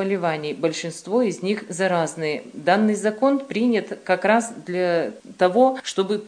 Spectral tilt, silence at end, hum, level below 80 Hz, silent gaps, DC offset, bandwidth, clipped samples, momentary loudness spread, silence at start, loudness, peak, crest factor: -5 dB/octave; 0 s; none; -74 dBFS; none; under 0.1%; 10 kHz; under 0.1%; 7 LU; 0 s; -22 LUFS; -2 dBFS; 18 dB